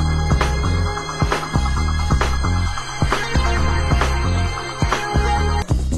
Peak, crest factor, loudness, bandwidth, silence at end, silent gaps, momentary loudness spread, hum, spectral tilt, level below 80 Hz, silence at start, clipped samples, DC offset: -2 dBFS; 16 dB; -20 LUFS; 12.5 kHz; 0 s; none; 4 LU; none; -5 dB/octave; -22 dBFS; 0 s; under 0.1%; under 0.1%